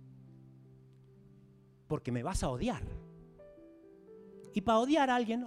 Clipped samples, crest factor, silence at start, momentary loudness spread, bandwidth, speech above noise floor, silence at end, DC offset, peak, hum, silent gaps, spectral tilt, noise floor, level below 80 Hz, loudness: under 0.1%; 20 dB; 0 s; 27 LU; 14.5 kHz; 29 dB; 0 s; under 0.1%; -16 dBFS; none; none; -5.5 dB/octave; -61 dBFS; -50 dBFS; -33 LUFS